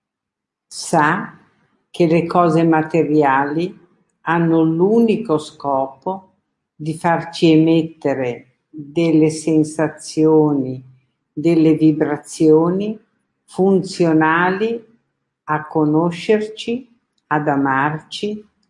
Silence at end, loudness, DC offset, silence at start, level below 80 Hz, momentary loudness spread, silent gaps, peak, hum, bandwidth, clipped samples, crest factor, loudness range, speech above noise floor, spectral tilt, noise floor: 0.3 s; -17 LUFS; under 0.1%; 0.7 s; -64 dBFS; 14 LU; none; -2 dBFS; none; 11.5 kHz; under 0.1%; 16 dB; 3 LU; 66 dB; -6.5 dB/octave; -82 dBFS